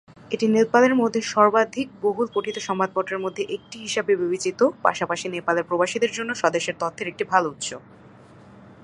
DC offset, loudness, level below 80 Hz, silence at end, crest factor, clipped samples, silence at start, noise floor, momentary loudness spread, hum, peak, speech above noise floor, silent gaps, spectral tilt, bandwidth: under 0.1%; -23 LUFS; -66 dBFS; 0.1 s; 22 dB; under 0.1%; 0.3 s; -48 dBFS; 10 LU; none; -2 dBFS; 25 dB; none; -4 dB/octave; 11 kHz